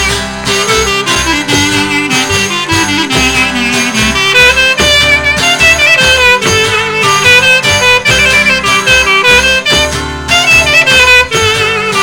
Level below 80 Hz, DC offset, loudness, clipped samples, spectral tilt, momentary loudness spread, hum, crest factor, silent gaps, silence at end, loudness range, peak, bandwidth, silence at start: -26 dBFS; under 0.1%; -6 LUFS; 0.2%; -2 dB/octave; 6 LU; none; 8 dB; none; 0 s; 4 LU; 0 dBFS; 17.5 kHz; 0 s